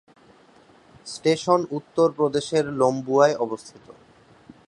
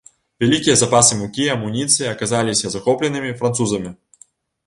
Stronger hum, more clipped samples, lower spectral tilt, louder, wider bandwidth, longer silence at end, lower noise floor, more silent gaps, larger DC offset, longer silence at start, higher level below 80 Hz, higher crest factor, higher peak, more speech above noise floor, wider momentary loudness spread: neither; neither; first, -5.5 dB/octave vs -3.5 dB/octave; second, -22 LUFS vs -17 LUFS; about the same, 11 kHz vs 11.5 kHz; about the same, 0.75 s vs 0.7 s; about the same, -54 dBFS vs -52 dBFS; neither; neither; first, 1.05 s vs 0.4 s; second, -64 dBFS vs -52 dBFS; about the same, 22 dB vs 18 dB; second, -4 dBFS vs 0 dBFS; about the same, 32 dB vs 34 dB; first, 12 LU vs 9 LU